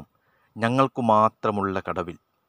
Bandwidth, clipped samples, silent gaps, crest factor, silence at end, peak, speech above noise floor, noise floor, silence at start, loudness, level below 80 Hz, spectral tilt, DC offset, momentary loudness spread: 10.5 kHz; under 0.1%; none; 20 dB; 0.35 s; -4 dBFS; 43 dB; -66 dBFS; 0 s; -23 LUFS; -64 dBFS; -7 dB/octave; under 0.1%; 11 LU